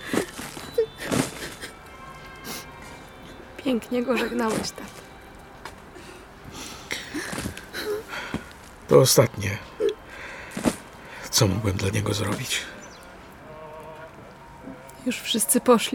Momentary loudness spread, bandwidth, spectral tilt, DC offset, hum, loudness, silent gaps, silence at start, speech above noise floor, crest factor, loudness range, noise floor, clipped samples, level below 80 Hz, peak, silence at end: 23 LU; 19 kHz; -4 dB/octave; under 0.1%; none; -25 LUFS; none; 0 s; 22 dB; 24 dB; 10 LU; -45 dBFS; under 0.1%; -52 dBFS; -4 dBFS; 0 s